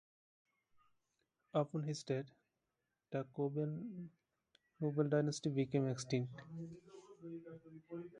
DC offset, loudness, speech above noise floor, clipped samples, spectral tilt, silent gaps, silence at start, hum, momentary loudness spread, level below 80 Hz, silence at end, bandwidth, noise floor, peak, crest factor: under 0.1%; -41 LUFS; 48 dB; under 0.1%; -6.5 dB/octave; none; 1.55 s; none; 19 LU; -80 dBFS; 0 s; 10.5 kHz; -89 dBFS; -22 dBFS; 20 dB